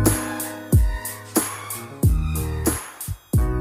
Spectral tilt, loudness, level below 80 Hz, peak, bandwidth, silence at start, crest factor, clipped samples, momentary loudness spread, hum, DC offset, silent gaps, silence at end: -5 dB/octave; -24 LUFS; -26 dBFS; -4 dBFS; 17 kHz; 0 s; 18 dB; under 0.1%; 10 LU; none; under 0.1%; none; 0 s